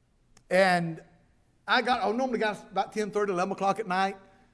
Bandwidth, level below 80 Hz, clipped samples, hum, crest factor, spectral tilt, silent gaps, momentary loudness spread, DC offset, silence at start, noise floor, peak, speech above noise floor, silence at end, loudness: 11 kHz; -66 dBFS; under 0.1%; none; 18 dB; -5 dB/octave; none; 10 LU; under 0.1%; 0.5 s; -64 dBFS; -10 dBFS; 37 dB; 0.35 s; -28 LUFS